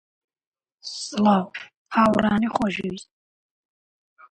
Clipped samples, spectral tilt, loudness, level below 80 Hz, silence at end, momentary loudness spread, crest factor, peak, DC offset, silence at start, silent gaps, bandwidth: under 0.1%; -5.5 dB/octave; -22 LUFS; -56 dBFS; 1.3 s; 18 LU; 20 dB; -4 dBFS; under 0.1%; 0.85 s; 1.76-1.85 s; 10.5 kHz